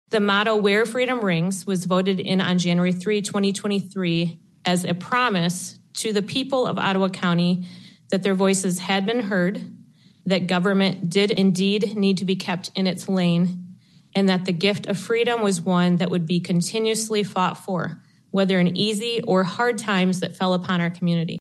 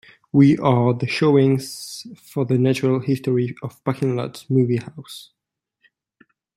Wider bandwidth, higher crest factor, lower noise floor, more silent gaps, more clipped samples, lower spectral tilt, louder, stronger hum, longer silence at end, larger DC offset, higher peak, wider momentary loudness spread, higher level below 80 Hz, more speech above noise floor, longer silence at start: second, 12.5 kHz vs 14.5 kHz; about the same, 16 dB vs 18 dB; second, -51 dBFS vs -69 dBFS; neither; neither; second, -5 dB/octave vs -7.5 dB/octave; about the same, -22 LUFS vs -20 LUFS; neither; second, 0 s vs 1.35 s; neither; second, -6 dBFS vs -2 dBFS; second, 6 LU vs 18 LU; second, -70 dBFS vs -62 dBFS; second, 30 dB vs 49 dB; second, 0.1 s vs 0.35 s